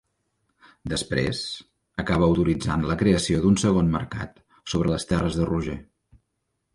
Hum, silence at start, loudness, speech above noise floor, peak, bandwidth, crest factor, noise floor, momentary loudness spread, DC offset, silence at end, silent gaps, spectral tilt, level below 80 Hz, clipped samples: none; 0.85 s; -24 LUFS; 54 dB; -6 dBFS; 11.5 kHz; 18 dB; -77 dBFS; 16 LU; under 0.1%; 0.95 s; none; -6 dB/octave; -40 dBFS; under 0.1%